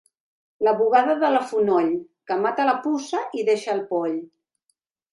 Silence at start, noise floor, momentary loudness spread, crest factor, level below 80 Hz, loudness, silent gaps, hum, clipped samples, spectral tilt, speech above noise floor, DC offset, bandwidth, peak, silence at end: 0.6 s; -74 dBFS; 9 LU; 18 dB; -72 dBFS; -22 LUFS; none; none; under 0.1%; -5 dB/octave; 52 dB; under 0.1%; 11.5 kHz; -6 dBFS; 0.85 s